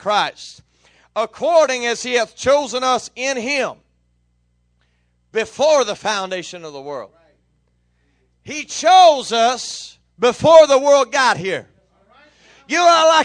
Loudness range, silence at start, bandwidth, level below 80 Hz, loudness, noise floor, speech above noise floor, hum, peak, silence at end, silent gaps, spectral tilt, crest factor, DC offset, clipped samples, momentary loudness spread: 9 LU; 0.05 s; 10 kHz; -58 dBFS; -16 LUFS; -63 dBFS; 47 dB; 60 Hz at -60 dBFS; 0 dBFS; 0 s; none; -2.5 dB/octave; 18 dB; under 0.1%; under 0.1%; 20 LU